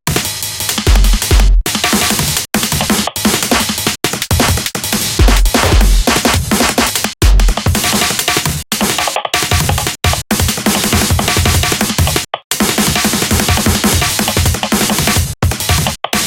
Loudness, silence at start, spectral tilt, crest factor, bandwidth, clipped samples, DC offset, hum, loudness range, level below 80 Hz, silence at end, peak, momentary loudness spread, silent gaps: -12 LUFS; 0.05 s; -3 dB/octave; 12 dB; 17.5 kHz; under 0.1%; under 0.1%; none; 1 LU; -18 dBFS; 0 s; 0 dBFS; 4 LU; 12.44-12.50 s